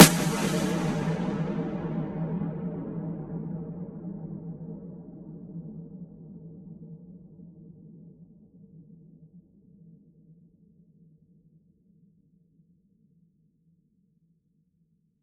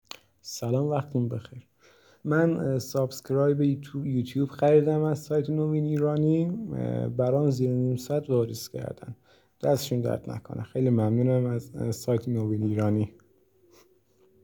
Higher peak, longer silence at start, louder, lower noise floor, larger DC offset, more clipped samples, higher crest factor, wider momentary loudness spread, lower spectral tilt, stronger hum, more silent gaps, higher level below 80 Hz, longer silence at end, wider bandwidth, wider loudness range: first, 0 dBFS vs -10 dBFS; second, 0 s vs 0.45 s; second, -30 LUFS vs -27 LUFS; first, -70 dBFS vs -63 dBFS; neither; neither; first, 30 dB vs 18 dB; first, 24 LU vs 12 LU; second, -4.5 dB/octave vs -7.5 dB/octave; neither; neither; first, -58 dBFS vs -64 dBFS; first, 5.3 s vs 1.35 s; second, 14 kHz vs over 20 kHz; first, 25 LU vs 4 LU